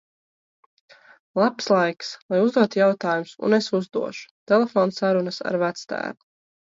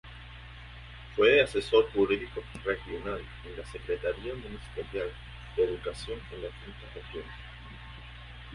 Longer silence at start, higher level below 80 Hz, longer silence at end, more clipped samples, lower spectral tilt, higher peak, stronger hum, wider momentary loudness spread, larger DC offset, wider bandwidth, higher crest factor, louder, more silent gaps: first, 1.35 s vs 0.05 s; second, -72 dBFS vs -48 dBFS; first, 0.55 s vs 0 s; neither; about the same, -5.5 dB/octave vs -5.5 dB/octave; first, -4 dBFS vs -10 dBFS; second, none vs 60 Hz at -45 dBFS; second, 11 LU vs 22 LU; neither; second, 7.8 kHz vs 11.5 kHz; about the same, 18 dB vs 22 dB; first, -22 LUFS vs -30 LUFS; first, 2.22-2.29 s, 4.31-4.46 s vs none